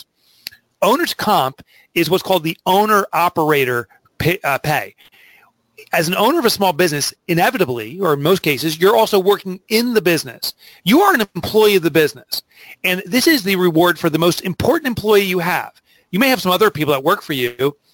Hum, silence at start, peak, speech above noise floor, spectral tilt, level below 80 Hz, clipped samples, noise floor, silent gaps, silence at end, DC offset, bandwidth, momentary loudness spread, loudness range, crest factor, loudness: none; 0.8 s; 0 dBFS; 36 dB; -4.5 dB/octave; -52 dBFS; under 0.1%; -52 dBFS; none; 0.2 s; under 0.1%; 17 kHz; 9 LU; 3 LU; 16 dB; -16 LUFS